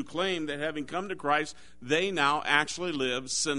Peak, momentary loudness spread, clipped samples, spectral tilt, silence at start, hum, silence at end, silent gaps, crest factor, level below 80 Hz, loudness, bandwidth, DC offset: -6 dBFS; 9 LU; under 0.1%; -2.5 dB/octave; 0 s; none; 0 s; none; 24 dB; -62 dBFS; -29 LUFS; 11 kHz; 0.4%